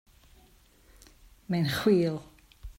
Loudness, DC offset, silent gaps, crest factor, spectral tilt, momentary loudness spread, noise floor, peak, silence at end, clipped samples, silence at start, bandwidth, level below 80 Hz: -28 LUFS; under 0.1%; none; 20 dB; -6.5 dB/octave; 9 LU; -60 dBFS; -12 dBFS; 0.05 s; under 0.1%; 1.5 s; 16 kHz; -54 dBFS